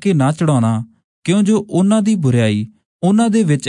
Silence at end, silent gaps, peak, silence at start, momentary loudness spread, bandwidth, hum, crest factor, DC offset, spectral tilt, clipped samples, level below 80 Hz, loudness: 0 s; 1.04-1.22 s, 2.85-3.00 s; -2 dBFS; 0 s; 9 LU; 11 kHz; none; 12 dB; under 0.1%; -7 dB/octave; under 0.1%; -60 dBFS; -15 LUFS